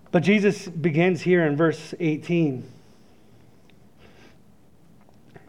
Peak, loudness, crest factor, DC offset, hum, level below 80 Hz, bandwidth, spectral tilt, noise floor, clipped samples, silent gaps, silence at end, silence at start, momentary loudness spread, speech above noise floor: -6 dBFS; -22 LUFS; 18 dB; 0.2%; none; -68 dBFS; 11 kHz; -7 dB/octave; -56 dBFS; under 0.1%; none; 2.8 s; 0.15 s; 7 LU; 34 dB